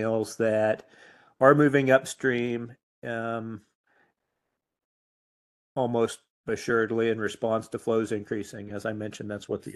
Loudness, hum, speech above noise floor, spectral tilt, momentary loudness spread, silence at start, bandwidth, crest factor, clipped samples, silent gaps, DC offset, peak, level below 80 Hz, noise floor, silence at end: -27 LUFS; none; 56 dB; -6 dB/octave; 16 LU; 0 s; 12.5 kHz; 24 dB; under 0.1%; 2.83-3.02 s, 3.75-3.84 s, 4.84-5.76 s, 6.30-6.44 s; under 0.1%; -4 dBFS; -66 dBFS; -82 dBFS; 0 s